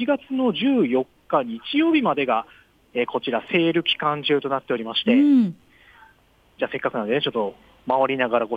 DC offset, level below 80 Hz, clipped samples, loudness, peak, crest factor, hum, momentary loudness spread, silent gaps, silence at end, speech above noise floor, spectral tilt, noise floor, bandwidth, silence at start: under 0.1%; -64 dBFS; under 0.1%; -22 LUFS; -6 dBFS; 16 dB; none; 8 LU; none; 0 s; 36 dB; -7.5 dB/octave; -58 dBFS; 5 kHz; 0 s